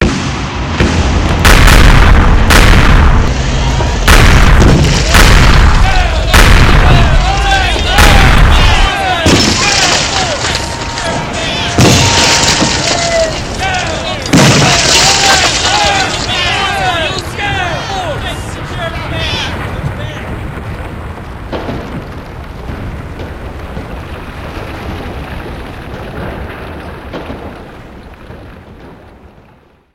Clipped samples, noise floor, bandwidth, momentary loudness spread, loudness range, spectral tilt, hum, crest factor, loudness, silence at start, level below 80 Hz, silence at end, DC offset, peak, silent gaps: 2%; -44 dBFS; 17 kHz; 19 LU; 16 LU; -3.5 dB/octave; none; 10 dB; -9 LUFS; 0 s; -14 dBFS; 0.65 s; under 0.1%; 0 dBFS; none